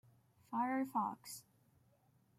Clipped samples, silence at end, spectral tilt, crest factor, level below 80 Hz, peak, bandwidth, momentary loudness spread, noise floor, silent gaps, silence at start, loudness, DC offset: under 0.1%; 1 s; -4.5 dB/octave; 18 dB; -86 dBFS; -26 dBFS; 15.5 kHz; 14 LU; -73 dBFS; none; 0.5 s; -40 LUFS; under 0.1%